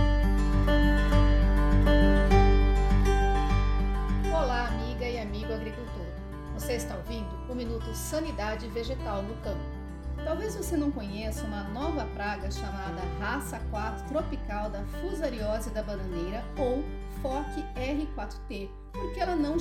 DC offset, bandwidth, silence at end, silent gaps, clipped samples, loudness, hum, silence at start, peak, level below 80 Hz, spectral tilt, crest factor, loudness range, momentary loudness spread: under 0.1%; 13.5 kHz; 0 s; none; under 0.1%; -30 LUFS; none; 0 s; -8 dBFS; -30 dBFS; -6.5 dB/octave; 20 dB; 10 LU; 13 LU